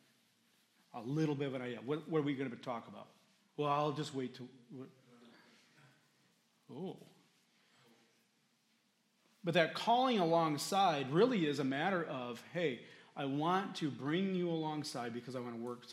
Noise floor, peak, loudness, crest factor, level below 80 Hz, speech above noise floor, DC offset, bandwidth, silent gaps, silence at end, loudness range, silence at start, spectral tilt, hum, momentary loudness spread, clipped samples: -76 dBFS; -16 dBFS; -37 LUFS; 24 dB; -90 dBFS; 40 dB; under 0.1%; 15.5 kHz; none; 0 s; 22 LU; 0.95 s; -5.5 dB/octave; none; 21 LU; under 0.1%